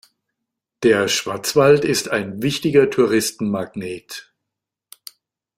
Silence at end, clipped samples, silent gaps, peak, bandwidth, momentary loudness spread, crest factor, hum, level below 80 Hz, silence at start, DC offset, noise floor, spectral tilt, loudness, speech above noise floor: 1.35 s; under 0.1%; none; -2 dBFS; 16.5 kHz; 16 LU; 18 dB; none; -58 dBFS; 0.8 s; under 0.1%; -83 dBFS; -4 dB/octave; -18 LUFS; 65 dB